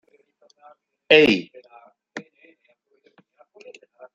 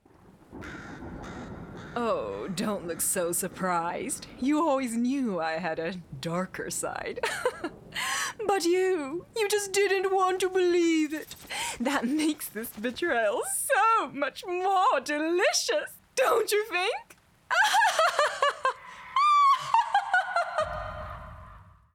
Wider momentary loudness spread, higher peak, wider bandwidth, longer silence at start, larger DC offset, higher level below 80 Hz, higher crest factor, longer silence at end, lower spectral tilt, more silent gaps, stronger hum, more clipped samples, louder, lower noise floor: first, 25 LU vs 15 LU; first, -2 dBFS vs -10 dBFS; second, 7.6 kHz vs 19 kHz; first, 1.1 s vs 0.5 s; neither; second, -64 dBFS vs -56 dBFS; first, 24 dB vs 18 dB; first, 1.95 s vs 0.3 s; first, -5 dB/octave vs -3 dB/octave; neither; neither; neither; first, -16 LUFS vs -27 LUFS; first, -65 dBFS vs -56 dBFS